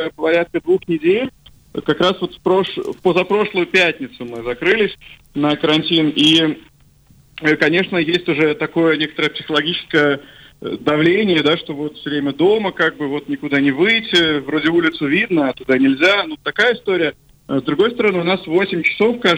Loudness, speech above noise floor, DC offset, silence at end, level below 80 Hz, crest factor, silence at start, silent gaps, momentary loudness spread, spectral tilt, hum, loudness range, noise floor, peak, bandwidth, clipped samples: -16 LUFS; 34 dB; under 0.1%; 0 s; -52 dBFS; 14 dB; 0 s; none; 9 LU; -5.5 dB/octave; none; 2 LU; -50 dBFS; -4 dBFS; 11.5 kHz; under 0.1%